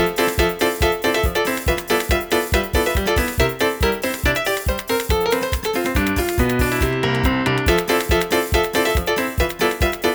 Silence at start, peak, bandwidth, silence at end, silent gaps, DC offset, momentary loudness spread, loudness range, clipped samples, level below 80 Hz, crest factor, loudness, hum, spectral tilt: 0 s; -2 dBFS; over 20 kHz; 0 s; none; under 0.1%; 3 LU; 1 LU; under 0.1%; -26 dBFS; 16 dB; -19 LUFS; none; -4.5 dB/octave